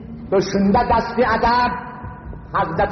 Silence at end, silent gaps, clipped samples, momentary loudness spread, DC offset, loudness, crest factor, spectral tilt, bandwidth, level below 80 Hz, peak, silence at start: 0 s; none; under 0.1%; 18 LU; under 0.1%; -18 LUFS; 14 dB; -4.5 dB/octave; 6.4 kHz; -36 dBFS; -6 dBFS; 0 s